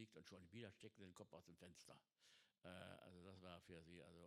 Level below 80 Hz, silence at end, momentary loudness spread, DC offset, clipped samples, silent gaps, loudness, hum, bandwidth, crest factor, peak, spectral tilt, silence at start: under -90 dBFS; 0 s; 6 LU; under 0.1%; under 0.1%; none; -63 LUFS; none; 13.5 kHz; 22 dB; -42 dBFS; -5 dB/octave; 0 s